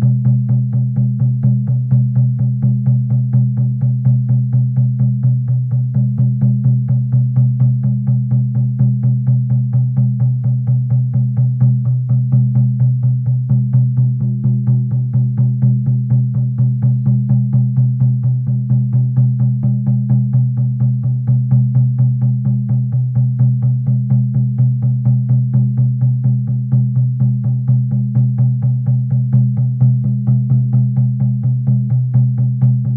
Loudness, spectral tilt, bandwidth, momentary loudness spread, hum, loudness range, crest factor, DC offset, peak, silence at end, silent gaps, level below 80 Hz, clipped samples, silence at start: -15 LUFS; -14.5 dB/octave; 1.2 kHz; 2 LU; none; 1 LU; 12 dB; under 0.1%; -2 dBFS; 0 s; none; -52 dBFS; under 0.1%; 0 s